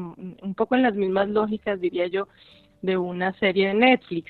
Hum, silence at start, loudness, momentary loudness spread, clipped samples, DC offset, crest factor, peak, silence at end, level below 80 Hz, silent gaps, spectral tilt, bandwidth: none; 0 s; -23 LUFS; 14 LU; under 0.1%; under 0.1%; 20 dB; -2 dBFS; 0.1 s; -62 dBFS; none; -8.5 dB/octave; 4.6 kHz